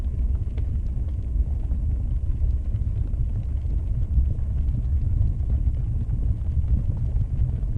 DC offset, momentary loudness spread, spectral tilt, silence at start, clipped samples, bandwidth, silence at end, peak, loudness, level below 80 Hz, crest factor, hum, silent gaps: under 0.1%; 3 LU; -10.5 dB/octave; 0 s; under 0.1%; 2.4 kHz; 0 s; -10 dBFS; -27 LUFS; -24 dBFS; 12 dB; none; none